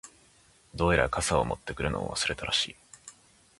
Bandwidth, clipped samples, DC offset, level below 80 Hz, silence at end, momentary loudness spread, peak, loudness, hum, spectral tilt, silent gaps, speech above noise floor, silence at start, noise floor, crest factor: 11.5 kHz; under 0.1%; under 0.1%; -44 dBFS; 0.5 s; 22 LU; -8 dBFS; -28 LUFS; none; -3.5 dB/octave; none; 32 dB; 0.05 s; -61 dBFS; 24 dB